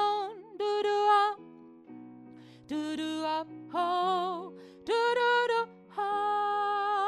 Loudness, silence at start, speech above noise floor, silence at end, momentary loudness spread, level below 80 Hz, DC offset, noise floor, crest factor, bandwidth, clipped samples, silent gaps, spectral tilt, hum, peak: -30 LUFS; 0 s; 19 dB; 0 s; 19 LU; -78 dBFS; under 0.1%; -51 dBFS; 16 dB; 12 kHz; under 0.1%; none; -3.5 dB/octave; none; -14 dBFS